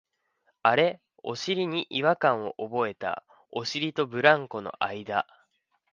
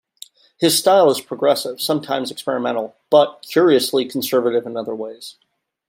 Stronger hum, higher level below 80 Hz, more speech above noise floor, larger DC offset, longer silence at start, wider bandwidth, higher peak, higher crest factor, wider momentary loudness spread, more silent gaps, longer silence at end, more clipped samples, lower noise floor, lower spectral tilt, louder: neither; about the same, -72 dBFS vs -72 dBFS; first, 46 dB vs 27 dB; neither; about the same, 0.65 s vs 0.6 s; second, 7.6 kHz vs 16.5 kHz; about the same, -4 dBFS vs -2 dBFS; first, 24 dB vs 18 dB; about the same, 14 LU vs 13 LU; neither; first, 0.7 s vs 0.55 s; neither; first, -72 dBFS vs -44 dBFS; about the same, -4.5 dB/octave vs -3.5 dB/octave; second, -27 LUFS vs -18 LUFS